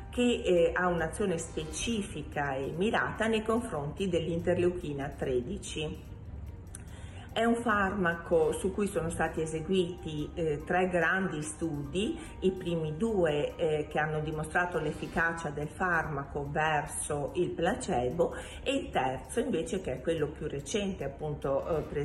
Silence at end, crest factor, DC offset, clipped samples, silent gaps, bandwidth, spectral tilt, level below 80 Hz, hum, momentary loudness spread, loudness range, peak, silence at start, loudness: 0 s; 16 dB; under 0.1%; under 0.1%; none; 13 kHz; -5 dB/octave; -48 dBFS; none; 9 LU; 3 LU; -16 dBFS; 0 s; -31 LUFS